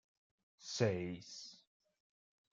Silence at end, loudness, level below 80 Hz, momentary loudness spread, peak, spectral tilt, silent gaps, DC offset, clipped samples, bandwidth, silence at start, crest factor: 0.95 s; -40 LUFS; -80 dBFS; 18 LU; -18 dBFS; -5 dB/octave; none; under 0.1%; under 0.1%; 9 kHz; 0.6 s; 26 dB